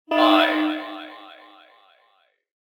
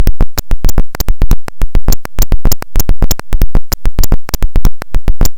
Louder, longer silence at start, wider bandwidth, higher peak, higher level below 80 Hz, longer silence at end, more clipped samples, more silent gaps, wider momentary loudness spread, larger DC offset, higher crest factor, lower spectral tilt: about the same, -19 LUFS vs -17 LUFS; about the same, 0.1 s vs 0 s; about the same, 18 kHz vs 17 kHz; second, -4 dBFS vs 0 dBFS; second, -76 dBFS vs -10 dBFS; first, 1.3 s vs 0.05 s; second, under 0.1% vs 10%; neither; first, 23 LU vs 3 LU; second, under 0.1% vs 30%; first, 20 dB vs 6 dB; second, -3 dB/octave vs -4.5 dB/octave